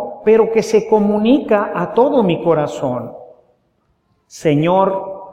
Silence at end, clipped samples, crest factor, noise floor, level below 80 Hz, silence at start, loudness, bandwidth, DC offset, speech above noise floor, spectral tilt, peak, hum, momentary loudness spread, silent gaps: 0 s; under 0.1%; 14 dB; -63 dBFS; -54 dBFS; 0 s; -15 LUFS; 11 kHz; under 0.1%; 48 dB; -7 dB/octave; 0 dBFS; none; 9 LU; none